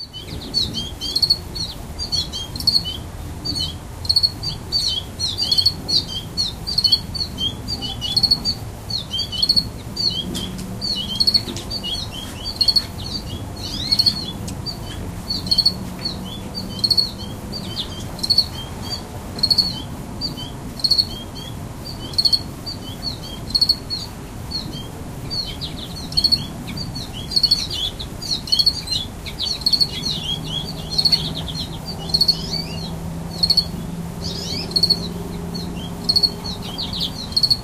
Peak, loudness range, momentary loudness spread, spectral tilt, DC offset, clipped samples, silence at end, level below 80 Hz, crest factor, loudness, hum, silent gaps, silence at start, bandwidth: -2 dBFS; 3 LU; 14 LU; -3 dB/octave; under 0.1%; under 0.1%; 0 s; -38 dBFS; 20 dB; -20 LUFS; none; none; 0 s; 16 kHz